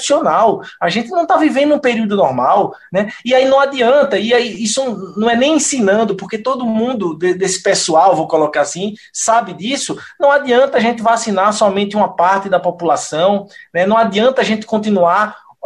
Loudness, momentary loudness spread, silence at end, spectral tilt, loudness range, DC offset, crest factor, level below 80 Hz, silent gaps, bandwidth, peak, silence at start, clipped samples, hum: -14 LUFS; 7 LU; 0.3 s; -3.5 dB/octave; 2 LU; under 0.1%; 12 dB; -58 dBFS; none; 12 kHz; -2 dBFS; 0 s; under 0.1%; none